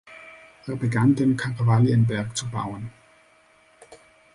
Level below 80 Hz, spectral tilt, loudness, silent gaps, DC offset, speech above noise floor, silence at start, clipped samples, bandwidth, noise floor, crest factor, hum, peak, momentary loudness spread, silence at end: -56 dBFS; -6.5 dB/octave; -23 LUFS; none; under 0.1%; 36 dB; 0.1 s; under 0.1%; 11 kHz; -57 dBFS; 18 dB; none; -6 dBFS; 22 LU; 0.4 s